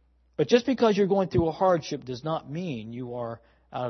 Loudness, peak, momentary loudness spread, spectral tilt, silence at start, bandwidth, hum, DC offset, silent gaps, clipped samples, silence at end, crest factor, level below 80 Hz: -26 LUFS; -6 dBFS; 14 LU; -6.5 dB/octave; 0.4 s; 6.4 kHz; none; under 0.1%; none; under 0.1%; 0 s; 20 dB; -54 dBFS